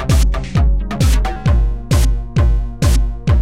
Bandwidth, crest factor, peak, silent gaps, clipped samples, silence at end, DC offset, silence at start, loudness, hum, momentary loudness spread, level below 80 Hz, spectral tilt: 15 kHz; 10 dB; -4 dBFS; none; under 0.1%; 0 s; 2%; 0 s; -16 LUFS; none; 2 LU; -14 dBFS; -6 dB/octave